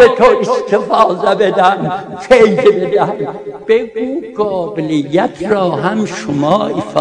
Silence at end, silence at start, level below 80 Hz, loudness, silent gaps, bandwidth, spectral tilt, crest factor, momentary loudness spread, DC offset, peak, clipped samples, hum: 0 s; 0 s; -46 dBFS; -13 LUFS; none; 10 kHz; -6 dB/octave; 12 dB; 11 LU; under 0.1%; 0 dBFS; 0.7%; none